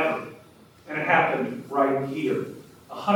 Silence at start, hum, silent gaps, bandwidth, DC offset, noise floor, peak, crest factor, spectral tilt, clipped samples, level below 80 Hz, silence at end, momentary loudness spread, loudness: 0 s; none; none; 19 kHz; under 0.1%; -52 dBFS; -8 dBFS; 18 dB; -6.5 dB/octave; under 0.1%; -70 dBFS; 0 s; 19 LU; -25 LUFS